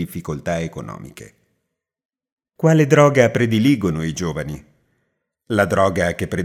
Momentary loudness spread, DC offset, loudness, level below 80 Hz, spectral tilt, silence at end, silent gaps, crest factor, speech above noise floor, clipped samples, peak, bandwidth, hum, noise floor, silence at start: 19 LU; under 0.1%; -18 LUFS; -50 dBFS; -6.5 dB/octave; 0 s; 2.05-2.09 s, 2.32-2.37 s; 20 dB; 60 dB; under 0.1%; 0 dBFS; 15.5 kHz; none; -77 dBFS; 0 s